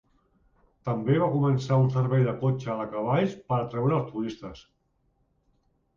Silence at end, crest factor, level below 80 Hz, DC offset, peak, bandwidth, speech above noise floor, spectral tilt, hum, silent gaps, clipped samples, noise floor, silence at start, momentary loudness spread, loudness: 1.35 s; 16 dB; -60 dBFS; under 0.1%; -12 dBFS; 7.2 kHz; 45 dB; -8.5 dB/octave; none; none; under 0.1%; -70 dBFS; 0.85 s; 10 LU; -26 LUFS